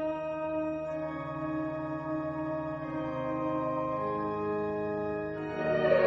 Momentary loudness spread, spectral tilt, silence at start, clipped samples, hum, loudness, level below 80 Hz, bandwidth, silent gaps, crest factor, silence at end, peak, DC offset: 4 LU; -8.5 dB/octave; 0 s; under 0.1%; none; -33 LUFS; -58 dBFS; 6.6 kHz; none; 20 dB; 0 s; -12 dBFS; under 0.1%